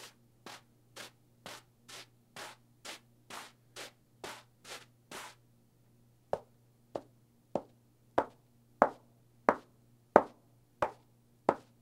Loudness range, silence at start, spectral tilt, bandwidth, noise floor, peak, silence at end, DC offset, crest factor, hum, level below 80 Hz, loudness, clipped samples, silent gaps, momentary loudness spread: 16 LU; 0 s; -4.5 dB/octave; 16 kHz; -67 dBFS; 0 dBFS; 0.2 s; under 0.1%; 38 dB; none; -72 dBFS; -37 LUFS; under 0.1%; none; 20 LU